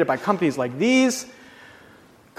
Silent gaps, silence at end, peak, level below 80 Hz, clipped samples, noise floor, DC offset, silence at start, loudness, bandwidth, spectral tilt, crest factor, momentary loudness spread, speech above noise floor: none; 1.05 s; -4 dBFS; -66 dBFS; under 0.1%; -51 dBFS; under 0.1%; 0 s; -21 LUFS; 14.5 kHz; -4.5 dB/octave; 20 dB; 11 LU; 30 dB